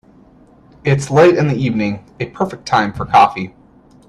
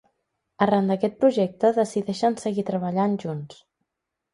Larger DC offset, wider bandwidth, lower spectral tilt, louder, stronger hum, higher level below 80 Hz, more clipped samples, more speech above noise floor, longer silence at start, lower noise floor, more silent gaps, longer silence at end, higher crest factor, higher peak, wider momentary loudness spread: neither; about the same, 11.5 kHz vs 11.5 kHz; about the same, -6.5 dB/octave vs -7 dB/octave; first, -15 LUFS vs -23 LUFS; neither; first, -46 dBFS vs -66 dBFS; neither; second, 32 dB vs 60 dB; first, 0.85 s vs 0.6 s; second, -46 dBFS vs -83 dBFS; neither; second, 0.6 s vs 0.8 s; about the same, 16 dB vs 18 dB; first, 0 dBFS vs -6 dBFS; first, 15 LU vs 8 LU